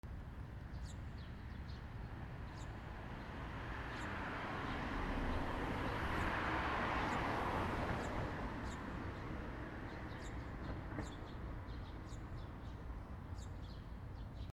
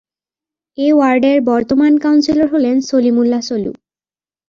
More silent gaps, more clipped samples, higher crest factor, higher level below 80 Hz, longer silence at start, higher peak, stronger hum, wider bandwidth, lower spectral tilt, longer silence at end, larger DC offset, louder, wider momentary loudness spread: neither; neither; first, 18 dB vs 12 dB; about the same, -50 dBFS vs -52 dBFS; second, 0.05 s vs 0.8 s; second, -26 dBFS vs -2 dBFS; neither; first, 16 kHz vs 7.4 kHz; about the same, -6 dB/octave vs -5.5 dB/octave; second, 0 s vs 0.75 s; neither; second, -45 LUFS vs -13 LUFS; first, 12 LU vs 9 LU